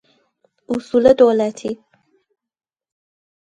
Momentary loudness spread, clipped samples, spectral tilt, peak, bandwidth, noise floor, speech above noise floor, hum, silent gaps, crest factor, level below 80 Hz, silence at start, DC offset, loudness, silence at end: 17 LU; under 0.1%; -6 dB/octave; 0 dBFS; 9.2 kHz; -63 dBFS; 48 dB; none; none; 20 dB; -54 dBFS; 0.7 s; under 0.1%; -16 LUFS; 1.85 s